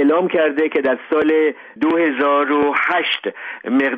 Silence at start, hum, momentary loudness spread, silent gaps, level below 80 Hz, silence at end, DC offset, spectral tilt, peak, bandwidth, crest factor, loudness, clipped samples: 0 s; none; 6 LU; none; -64 dBFS; 0 s; under 0.1%; -6.5 dB/octave; -6 dBFS; 5 kHz; 10 dB; -17 LUFS; under 0.1%